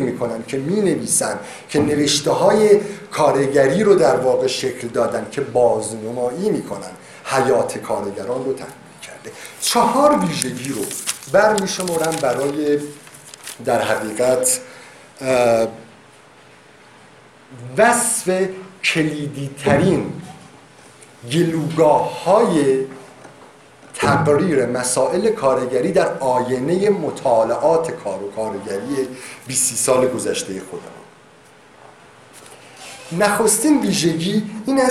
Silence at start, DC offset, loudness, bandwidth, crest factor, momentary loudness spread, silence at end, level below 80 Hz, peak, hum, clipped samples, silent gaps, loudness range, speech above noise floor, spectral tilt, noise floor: 0 s; under 0.1%; -18 LUFS; 16 kHz; 18 dB; 15 LU; 0 s; -54 dBFS; 0 dBFS; none; under 0.1%; none; 5 LU; 29 dB; -4 dB/octave; -47 dBFS